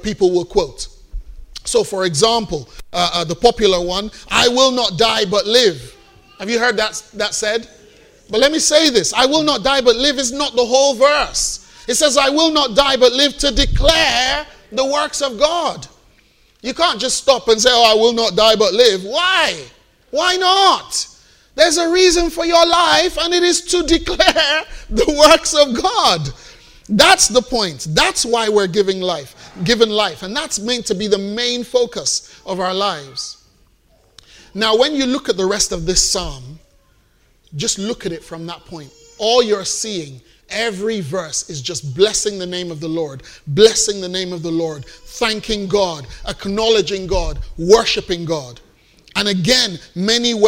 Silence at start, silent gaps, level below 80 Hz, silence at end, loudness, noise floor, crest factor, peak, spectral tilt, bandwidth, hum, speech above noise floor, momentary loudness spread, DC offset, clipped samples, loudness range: 0 s; none; -34 dBFS; 0 s; -15 LUFS; -55 dBFS; 16 dB; 0 dBFS; -2.5 dB/octave; 16 kHz; none; 39 dB; 14 LU; under 0.1%; under 0.1%; 7 LU